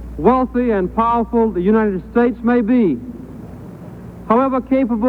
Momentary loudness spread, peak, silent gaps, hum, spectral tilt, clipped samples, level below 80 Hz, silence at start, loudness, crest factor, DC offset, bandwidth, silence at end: 20 LU; -2 dBFS; none; none; -9.5 dB/octave; under 0.1%; -38 dBFS; 0 s; -16 LUFS; 14 dB; under 0.1%; 4.4 kHz; 0 s